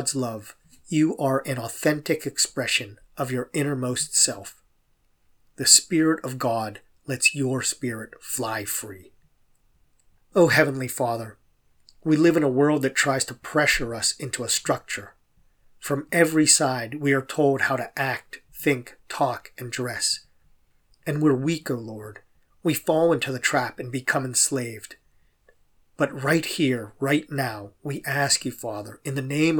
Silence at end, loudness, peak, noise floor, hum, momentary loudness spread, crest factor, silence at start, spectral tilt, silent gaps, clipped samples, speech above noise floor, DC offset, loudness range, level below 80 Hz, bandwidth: 0 s; -23 LUFS; 0 dBFS; -65 dBFS; none; 15 LU; 24 dB; 0 s; -3.5 dB/octave; none; under 0.1%; 41 dB; under 0.1%; 5 LU; -56 dBFS; over 20 kHz